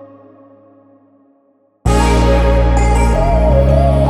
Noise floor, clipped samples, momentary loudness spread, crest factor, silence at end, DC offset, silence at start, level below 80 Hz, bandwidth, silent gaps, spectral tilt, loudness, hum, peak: -55 dBFS; under 0.1%; 3 LU; 12 dB; 0 s; under 0.1%; 0 s; -16 dBFS; 12 kHz; none; -7 dB/octave; -13 LUFS; none; 0 dBFS